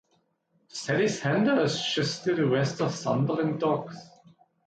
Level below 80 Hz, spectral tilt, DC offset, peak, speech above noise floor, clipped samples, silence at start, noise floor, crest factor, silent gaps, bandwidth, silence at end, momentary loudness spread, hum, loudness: -68 dBFS; -5.5 dB/octave; under 0.1%; -14 dBFS; 45 dB; under 0.1%; 0.75 s; -71 dBFS; 14 dB; none; 9.2 kHz; 0.6 s; 10 LU; none; -27 LUFS